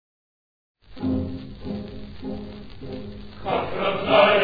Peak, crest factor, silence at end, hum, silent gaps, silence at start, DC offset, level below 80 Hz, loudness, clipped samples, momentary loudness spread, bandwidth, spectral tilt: -4 dBFS; 20 dB; 0 s; none; none; 0.9 s; under 0.1%; -48 dBFS; -25 LUFS; under 0.1%; 19 LU; 5 kHz; -8 dB/octave